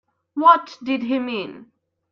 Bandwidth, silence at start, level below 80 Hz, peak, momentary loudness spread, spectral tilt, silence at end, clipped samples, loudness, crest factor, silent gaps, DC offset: 7 kHz; 0.35 s; -70 dBFS; -2 dBFS; 16 LU; -5.5 dB/octave; 0.5 s; under 0.1%; -19 LUFS; 18 dB; none; under 0.1%